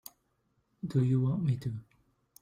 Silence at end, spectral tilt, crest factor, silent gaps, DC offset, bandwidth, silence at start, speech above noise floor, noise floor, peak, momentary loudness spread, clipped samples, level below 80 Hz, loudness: 0.6 s; -9 dB/octave; 16 dB; none; under 0.1%; 16 kHz; 0.85 s; 46 dB; -75 dBFS; -16 dBFS; 16 LU; under 0.1%; -64 dBFS; -31 LUFS